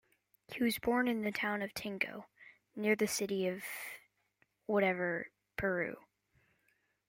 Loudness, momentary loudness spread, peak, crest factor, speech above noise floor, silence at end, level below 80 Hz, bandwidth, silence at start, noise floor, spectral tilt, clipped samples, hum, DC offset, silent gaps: -35 LUFS; 16 LU; -18 dBFS; 20 dB; 42 dB; 1.1 s; -68 dBFS; 16.5 kHz; 0.5 s; -77 dBFS; -4.5 dB/octave; under 0.1%; 50 Hz at -65 dBFS; under 0.1%; none